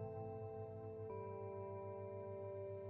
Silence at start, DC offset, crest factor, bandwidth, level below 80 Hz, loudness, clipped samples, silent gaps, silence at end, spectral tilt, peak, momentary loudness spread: 0 s; under 0.1%; 12 dB; 3.9 kHz; -78 dBFS; -50 LUFS; under 0.1%; none; 0 s; -10 dB/octave; -38 dBFS; 2 LU